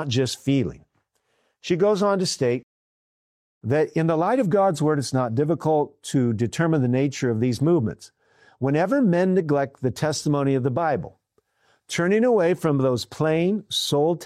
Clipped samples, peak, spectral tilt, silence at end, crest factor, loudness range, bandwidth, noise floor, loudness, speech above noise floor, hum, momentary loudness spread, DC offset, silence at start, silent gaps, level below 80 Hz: under 0.1%; -10 dBFS; -6 dB/octave; 0 s; 12 dB; 2 LU; 15 kHz; -70 dBFS; -22 LUFS; 49 dB; none; 6 LU; under 0.1%; 0 s; 2.63-3.61 s; -60 dBFS